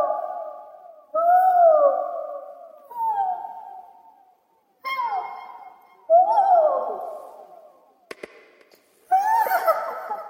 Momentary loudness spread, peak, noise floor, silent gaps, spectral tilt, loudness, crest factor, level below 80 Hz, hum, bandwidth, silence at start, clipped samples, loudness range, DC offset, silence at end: 24 LU; -6 dBFS; -64 dBFS; none; -2 dB/octave; -21 LUFS; 16 dB; -80 dBFS; none; 16 kHz; 0 s; under 0.1%; 9 LU; under 0.1%; 0 s